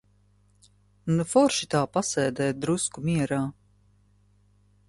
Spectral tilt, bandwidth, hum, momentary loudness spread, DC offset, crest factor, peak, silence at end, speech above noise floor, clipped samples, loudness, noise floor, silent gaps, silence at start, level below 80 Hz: -5 dB/octave; 11.5 kHz; 50 Hz at -55 dBFS; 7 LU; under 0.1%; 20 dB; -8 dBFS; 1.35 s; 37 dB; under 0.1%; -26 LUFS; -62 dBFS; none; 1.05 s; -60 dBFS